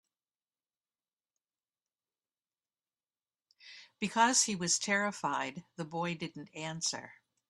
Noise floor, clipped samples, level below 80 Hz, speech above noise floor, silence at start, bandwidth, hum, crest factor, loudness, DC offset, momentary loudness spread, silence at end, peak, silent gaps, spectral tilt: under -90 dBFS; under 0.1%; -80 dBFS; over 56 dB; 3.65 s; 12.5 kHz; none; 26 dB; -32 LUFS; under 0.1%; 17 LU; 0.35 s; -12 dBFS; none; -2 dB/octave